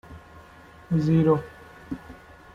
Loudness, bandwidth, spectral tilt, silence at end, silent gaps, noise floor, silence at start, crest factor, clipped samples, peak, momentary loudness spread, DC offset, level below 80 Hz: -23 LUFS; 7 kHz; -9.5 dB/octave; 0.4 s; none; -49 dBFS; 0.1 s; 18 dB; under 0.1%; -10 dBFS; 26 LU; under 0.1%; -52 dBFS